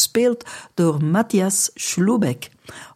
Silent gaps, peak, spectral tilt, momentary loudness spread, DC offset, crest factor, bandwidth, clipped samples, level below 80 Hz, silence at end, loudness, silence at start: none; -4 dBFS; -4.5 dB/octave; 13 LU; under 0.1%; 16 dB; 16 kHz; under 0.1%; -64 dBFS; 0.1 s; -19 LUFS; 0 s